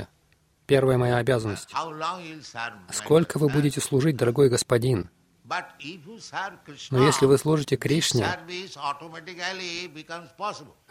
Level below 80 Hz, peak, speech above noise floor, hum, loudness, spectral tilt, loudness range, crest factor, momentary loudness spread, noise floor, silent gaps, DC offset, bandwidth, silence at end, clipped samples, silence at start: -56 dBFS; -6 dBFS; 39 dB; none; -25 LUFS; -5 dB/octave; 3 LU; 20 dB; 18 LU; -64 dBFS; none; under 0.1%; 16 kHz; 0.25 s; under 0.1%; 0 s